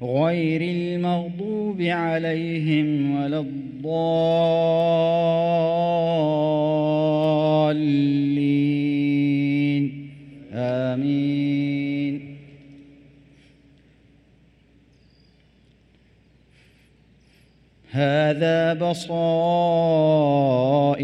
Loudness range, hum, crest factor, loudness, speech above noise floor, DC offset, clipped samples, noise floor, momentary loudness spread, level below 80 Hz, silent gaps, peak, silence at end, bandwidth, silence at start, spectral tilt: 7 LU; none; 14 dB; -21 LUFS; 36 dB; under 0.1%; under 0.1%; -57 dBFS; 7 LU; -62 dBFS; none; -8 dBFS; 0 s; 9.2 kHz; 0 s; -8 dB/octave